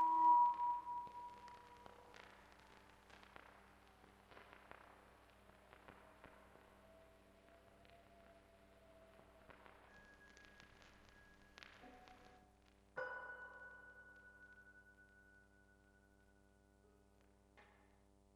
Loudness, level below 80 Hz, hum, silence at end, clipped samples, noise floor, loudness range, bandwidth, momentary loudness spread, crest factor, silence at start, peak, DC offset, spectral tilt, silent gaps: -40 LUFS; -76 dBFS; 60 Hz at -75 dBFS; 3.9 s; under 0.1%; -72 dBFS; 12 LU; 12.5 kHz; 20 LU; 22 dB; 0 s; -26 dBFS; under 0.1%; -4.5 dB/octave; none